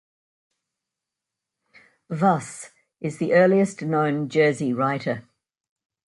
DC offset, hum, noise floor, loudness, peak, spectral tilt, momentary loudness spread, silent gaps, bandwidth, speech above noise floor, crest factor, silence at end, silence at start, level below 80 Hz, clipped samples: under 0.1%; none; -86 dBFS; -22 LUFS; -4 dBFS; -6.5 dB/octave; 16 LU; none; 11.5 kHz; 64 dB; 20 dB; 0.9 s; 2.1 s; -70 dBFS; under 0.1%